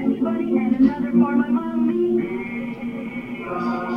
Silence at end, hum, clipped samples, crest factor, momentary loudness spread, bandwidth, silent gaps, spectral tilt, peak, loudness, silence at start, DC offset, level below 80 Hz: 0 s; none; under 0.1%; 16 dB; 11 LU; 5.4 kHz; none; -9 dB/octave; -6 dBFS; -22 LUFS; 0 s; under 0.1%; -52 dBFS